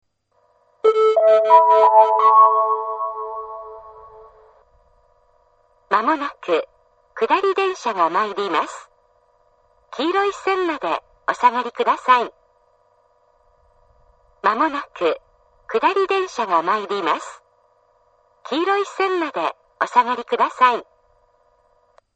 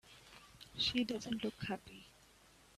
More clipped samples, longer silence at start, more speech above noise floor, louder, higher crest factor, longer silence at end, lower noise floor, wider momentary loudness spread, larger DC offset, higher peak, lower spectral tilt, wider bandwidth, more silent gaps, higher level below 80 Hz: neither; first, 0.85 s vs 0.05 s; first, 45 dB vs 25 dB; first, -18 LUFS vs -39 LUFS; about the same, 20 dB vs 22 dB; first, 1.35 s vs 0.65 s; about the same, -64 dBFS vs -65 dBFS; second, 16 LU vs 22 LU; neither; first, -2 dBFS vs -22 dBFS; about the same, -3.5 dB/octave vs -4 dB/octave; second, 8.6 kHz vs 14 kHz; neither; about the same, -66 dBFS vs -66 dBFS